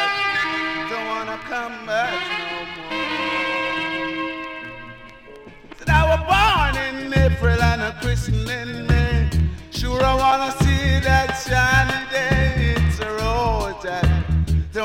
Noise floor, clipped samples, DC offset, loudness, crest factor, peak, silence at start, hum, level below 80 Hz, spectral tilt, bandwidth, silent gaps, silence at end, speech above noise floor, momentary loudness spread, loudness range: -41 dBFS; under 0.1%; under 0.1%; -20 LUFS; 16 dB; -4 dBFS; 0 s; none; -26 dBFS; -5.5 dB/octave; 16 kHz; none; 0 s; 20 dB; 11 LU; 5 LU